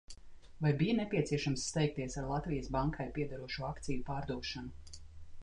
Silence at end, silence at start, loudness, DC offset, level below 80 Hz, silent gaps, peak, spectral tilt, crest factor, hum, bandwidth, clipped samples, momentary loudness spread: 0 s; 0.1 s; -37 LUFS; under 0.1%; -50 dBFS; none; -18 dBFS; -5.5 dB/octave; 18 dB; none; 10.5 kHz; under 0.1%; 17 LU